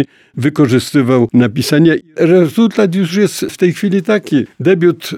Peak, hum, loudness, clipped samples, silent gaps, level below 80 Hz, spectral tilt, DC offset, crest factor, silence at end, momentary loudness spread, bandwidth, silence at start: 0 dBFS; none; -12 LUFS; under 0.1%; none; -54 dBFS; -6.5 dB/octave; under 0.1%; 12 dB; 0 s; 5 LU; 16.5 kHz; 0 s